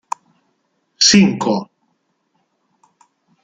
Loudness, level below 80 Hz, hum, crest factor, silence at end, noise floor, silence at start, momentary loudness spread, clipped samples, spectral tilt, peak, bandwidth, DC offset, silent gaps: -13 LUFS; -56 dBFS; none; 20 dB; 1.8 s; -67 dBFS; 1 s; 20 LU; under 0.1%; -3.5 dB/octave; 0 dBFS; 9.4 kHz; under 0.1%; none